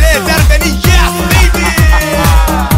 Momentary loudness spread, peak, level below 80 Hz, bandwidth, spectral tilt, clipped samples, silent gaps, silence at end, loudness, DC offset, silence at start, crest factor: 1 LU; 0 dBFS; -10 dBFS; 16.5 kHz; -4.5 dB/octave; under 0.1%; none; 0 s; -9 LUFS; under 0.1%; 0 s; 8 dB